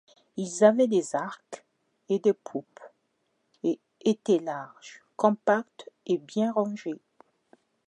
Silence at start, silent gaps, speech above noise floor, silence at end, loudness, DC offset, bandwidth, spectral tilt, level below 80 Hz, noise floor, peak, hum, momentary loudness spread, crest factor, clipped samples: 0.35 s; none; 49 dB; 0.95 s; -27 LUFS; under 0.1%; 10.5 kHz; -5.5 dB/octave; -84 dBFS; -75 dBFS; -6 dBFS; none; 21 LU; 24 dB; under 0.1%